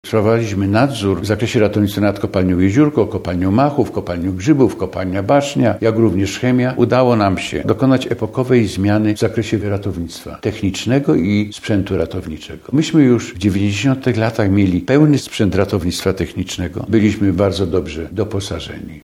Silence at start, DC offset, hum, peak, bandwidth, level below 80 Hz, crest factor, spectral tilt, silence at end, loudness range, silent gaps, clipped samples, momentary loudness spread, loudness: 0.05 s; under 0.1%; none; 0 dBFS; 15.5 kHz; -42 dBFS; 16 dB; -6.5 dB/octave; 0.05 s; 3 LU; none; under 0.1%; 9 LU; -16 LUFS